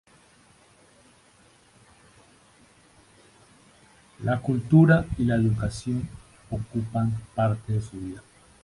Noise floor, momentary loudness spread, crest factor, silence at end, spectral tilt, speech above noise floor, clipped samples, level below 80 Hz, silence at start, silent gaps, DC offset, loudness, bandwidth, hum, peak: -58 dBFS; 18 LU; 22 dB; 0.45 s; -8 dB/octave; 34 dB; under 0.1%; -46 dBFS; 4.2 s; none; under 0.1%; -25 LUFS; 11.5 kHz; none; -6 dBFS